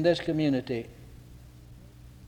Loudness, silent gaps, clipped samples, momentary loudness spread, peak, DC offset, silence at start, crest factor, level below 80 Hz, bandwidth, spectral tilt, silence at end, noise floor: -29 LUFS; none; under 0.1%; 24 LU; -12 dBFS; under 0.1%; 0 s; 20 dB; -54 dBFS; 19.5 kHz; -7 dB/octave; 0 s; -50 dBFS